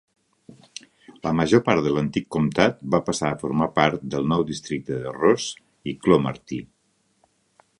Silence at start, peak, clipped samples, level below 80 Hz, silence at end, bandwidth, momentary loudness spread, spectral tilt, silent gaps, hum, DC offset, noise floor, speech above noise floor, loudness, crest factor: 0.5 s; 0 dBFS; under 0.1%; -52 dBFS; 1.15 s; 11 kHz; 15 LU; -5.5 dB/octave; none; none; under 0.1%; -67 dBFS; 46 dB; -23 LUFS; 22 dB